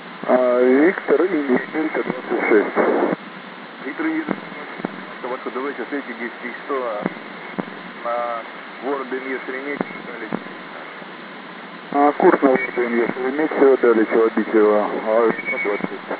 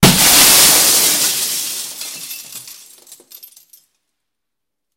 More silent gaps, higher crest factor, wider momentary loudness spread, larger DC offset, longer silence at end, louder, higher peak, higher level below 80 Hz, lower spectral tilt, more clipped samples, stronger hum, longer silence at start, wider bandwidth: neither; about the same, 20 dB vs 16 dB; second, 18 LU vs 22 LU; neither; second, 0 s vs 2.25 s; second, -20 LUFS vs -9 LUFS; about the same, 0 dBFS vs 0 dBFS; second, -88 dBFS vs -42 dBFS; first, -9.5 dB/octave vs -1.5 dB/octave; second, under 0.1% vs 0.1%; neither; about the same, 0 s vs 0 s; second, 4 kHz vs over 20 kHz